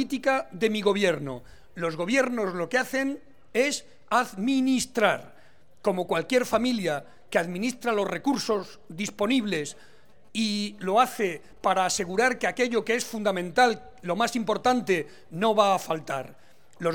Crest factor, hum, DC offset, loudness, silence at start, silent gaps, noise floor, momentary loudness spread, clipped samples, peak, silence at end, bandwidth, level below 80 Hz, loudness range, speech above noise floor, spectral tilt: 20 dB; none; 0.4%; -26 LUFS; 0 s; none; -55 dBFS; 10 LU; under 0.1%; -6 dBFS; 0 s; 19.5 kHz; -62 dBFS; 3 LU; 29 dB; -4 dB/octave